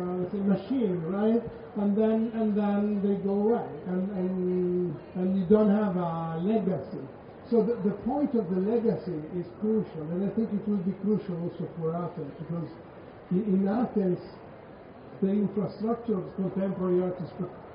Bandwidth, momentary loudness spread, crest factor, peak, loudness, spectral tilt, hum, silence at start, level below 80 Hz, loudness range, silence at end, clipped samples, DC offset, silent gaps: 5.2 kHz; 11 LU; 18 dB; -10 dBFS; -29 LUFS; -9 dB/octave; none; 0 s; -60 dBFS; 4 LU; 0 s; under 0.1%; under 0.1%; none